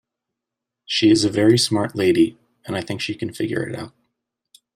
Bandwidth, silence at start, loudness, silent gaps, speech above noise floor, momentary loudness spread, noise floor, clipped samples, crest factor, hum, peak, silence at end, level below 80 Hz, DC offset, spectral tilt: 15 kHz; 0.9 s; -20 LUFS; none; 65 dB; 13 LU; -84 dBFS; under 0.1%; 18 dB; none; -4 dBFS; 0.85 s; -58 dBFS; under 0.1%; -5 dB/octave